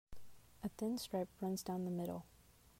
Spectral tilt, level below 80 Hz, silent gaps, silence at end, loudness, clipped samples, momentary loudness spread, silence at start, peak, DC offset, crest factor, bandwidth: -6 dB/octave; -66 dBFS; none; 0 s; -43 LUFS; under 0.1%; 8 LU; 0.1 s; -30 dBFS; under 0.1%; 14 dB; 16 kHz